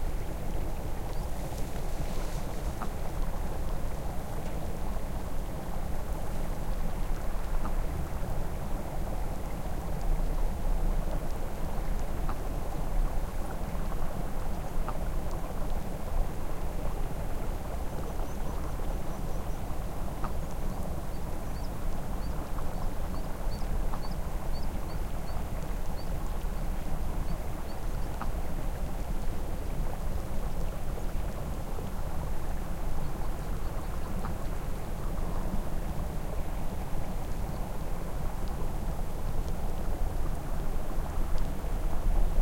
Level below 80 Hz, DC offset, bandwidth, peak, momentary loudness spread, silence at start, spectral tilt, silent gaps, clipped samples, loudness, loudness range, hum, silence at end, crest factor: -32 dBFS; 1%; 16.5 kHz; -14 dBFS; 2 LU; 0 s; -6 dB/octave; none; under 0.1%; -37 LUFS; 2 LU; none; 0 s; 16 dB